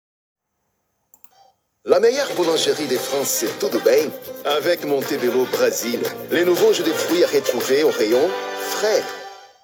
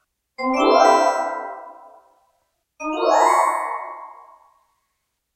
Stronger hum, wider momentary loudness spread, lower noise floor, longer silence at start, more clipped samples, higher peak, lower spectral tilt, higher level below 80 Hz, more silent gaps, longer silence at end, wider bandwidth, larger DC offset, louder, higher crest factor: neither; second, 8 LU vs 20 LU; about the same, -73 dBFS vs -75 dBFS; first, 1.85 s vs 0.4 s; neither; about the same, -2 dBFS vs -2 dBFS; first, -3 dB/octave vs -1.5 dB/octave; second, -70 dBFS vs -62 dBFS; neither; second, 0.15 s vs 1.2 s; first, over 20 kHz vs 16 kHz; neither; about the same, -19 LUFS vs -18 LUFS; about the same, 18 dB vs 20 dB